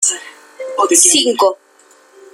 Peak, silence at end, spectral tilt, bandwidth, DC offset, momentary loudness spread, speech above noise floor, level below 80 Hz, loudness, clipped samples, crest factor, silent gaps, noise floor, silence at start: 0 dBFS; 0.8 s; 0.5 dB/octave; over 20 kHz; under 0.1%; 21 LU; 35 dB; -64 dBFS; -11 LUFS; under 0.1%; 16 dB; none; -48 dBFS; 0 s